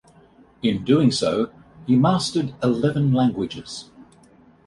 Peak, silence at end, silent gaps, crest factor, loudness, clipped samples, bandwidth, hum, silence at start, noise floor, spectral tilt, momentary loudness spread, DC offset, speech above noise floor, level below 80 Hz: -6 dBFS; 0.65 s; none; 16 dB; -21 LUFS; under 0.1%; 11.5 kHz; none; 0.65 s; -52 dBFS; -6.5 dB/octave; 14 LU; under 0.1%; 32 dB; -54 dBFS